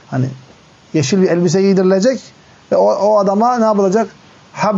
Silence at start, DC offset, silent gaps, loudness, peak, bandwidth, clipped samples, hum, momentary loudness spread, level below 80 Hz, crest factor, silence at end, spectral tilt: 0.1 s; under 0.1%; none; -14 LUFS; -4 dBFS; 8 kHz; under 0.1%; none; 10 LU; -62 dBFS; 12 dB; 0 s; -6.5 dB/octave